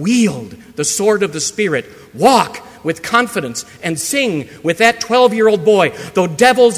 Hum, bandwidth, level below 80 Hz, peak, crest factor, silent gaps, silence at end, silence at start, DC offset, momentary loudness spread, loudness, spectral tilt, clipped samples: none; 16 kHz; -54 dBFS; 0 dBFS; 14 dB; none; 0 s; 0 s; under 0.1%; 11 LU; -14 LUFS; -3.5 dB/octave; under 0.1%